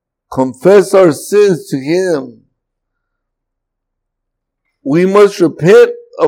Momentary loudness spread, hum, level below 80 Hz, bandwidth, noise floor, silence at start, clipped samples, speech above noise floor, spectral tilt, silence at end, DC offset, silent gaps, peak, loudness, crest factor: 10 LU; none; -58 dBFS; 16 kHz; -74 dBFS; 0.3 s; 0.7%; 65 dB; -6 dB/octave; 0 s; under 0.1%; none; 0 dBFS; -10 LUFS; 12 dB